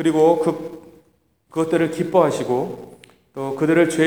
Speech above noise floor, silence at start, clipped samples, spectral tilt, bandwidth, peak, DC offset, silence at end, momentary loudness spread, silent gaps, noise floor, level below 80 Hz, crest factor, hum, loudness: 43 dB; 0 s; under 0.1%; -6 dB/octave; 19.5 kHz; -2 dBFS; 0.1%; 0 s; 15 LU; none; -61 dBFS; -62 dBFS; 18 dB; none; -20 LUFS